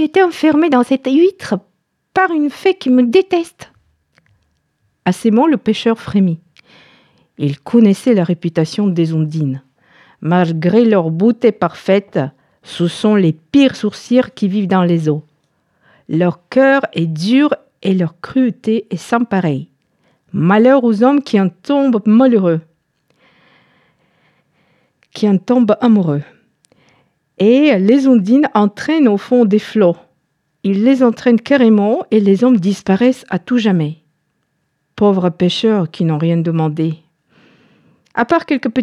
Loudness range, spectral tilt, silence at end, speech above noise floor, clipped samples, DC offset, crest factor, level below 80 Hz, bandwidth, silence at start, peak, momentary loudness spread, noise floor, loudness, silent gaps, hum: 4 LU; -7.5 dB/octave; 0 s; 54 dB; under 0.1%; under 0.1%; 14 dB; -60 dBFS; 11.5 kHz; 0 s; -2 dBFS; 10 LU; -67 dBFS; -14 LUFS; none; none